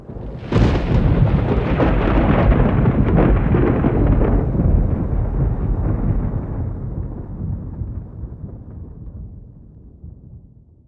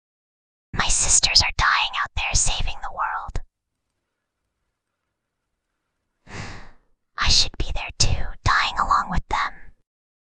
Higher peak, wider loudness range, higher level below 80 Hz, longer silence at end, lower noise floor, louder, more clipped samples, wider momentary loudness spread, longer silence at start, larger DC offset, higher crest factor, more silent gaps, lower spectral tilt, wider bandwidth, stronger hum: about the same, 0 dBFS vs -2 dBFS; about the same, 15 LU vs 14 LU; first, -22 dBFS vs -32 dBFS; second, 0.5 s vs 0.7 s; second, -45 dBFS vs -79 dBFS; first, -18 LUFS vs -21 LUFS; neither; about the same, 19 LU vs 20 LU; second, 0 s vs 0.75 s; neither; second, 16 dB vs 22 dB; neither; first, -10 dB/octave vs -1 dB/octave; second, 5.6 kHz vs 10.5 kHz; neither